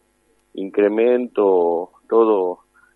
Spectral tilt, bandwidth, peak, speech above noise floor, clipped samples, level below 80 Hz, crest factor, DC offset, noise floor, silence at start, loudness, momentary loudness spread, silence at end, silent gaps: -8 dB/octave; 4 kHz; -4 dBFS; 45 dB; under 0.1%; -72 dBFS; 16 dB; under 0.1%; -62 dBFS; 0.55 s; -18 LUFS; 14 LU; 0.4 s; none